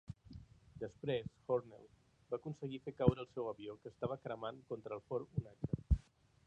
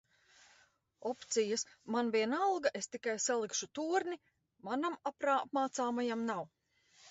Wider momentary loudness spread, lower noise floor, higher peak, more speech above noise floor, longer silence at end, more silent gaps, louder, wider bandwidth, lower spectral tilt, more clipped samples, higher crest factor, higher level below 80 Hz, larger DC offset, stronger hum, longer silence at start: first, 19 LU vs 10 LU; second, -59 dBFS vs -70 dBFS; first, -14 dBFS vs -18 dBFS; second, 18 dB vs 34 dB; first, 0.45 s vs 0 s; neither; second, -42 LUFS vs -36 LUFS; about the same, 8.6 kHz vs 8 kHz; first, -9 dB/octave vs -2 dB/octave; neither; first, 28 dB vs 18 dB; first, -50 dBFS vs -82 dBFS; neither; neither; second, 0.1 s vs 1 s